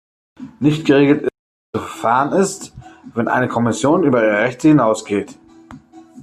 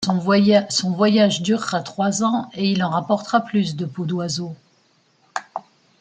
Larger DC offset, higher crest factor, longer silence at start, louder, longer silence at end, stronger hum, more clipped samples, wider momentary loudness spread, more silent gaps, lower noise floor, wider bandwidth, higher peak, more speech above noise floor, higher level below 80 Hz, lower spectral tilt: neither; about the same, 16 dB vs 16 dB; first, 0.4 s vs 0 s; first, -16 LUFS vs -20 LUFS; second, 0 s vs 0.4 s; neither; neither; about the same, 14 LU vs 14 LU; first, 1.39-1.73 s vs none; second, -41 dBFS vs -60 dBFS; first, 13.5 kHz vs 9.4 kHz; about the same, -2 dBFS vs -4 dBFS; second, 26 dB vs 41 dB; first, -54 dBFS vs -64 dBFS; about the same, -6 dB/octave vs -5 dB/octave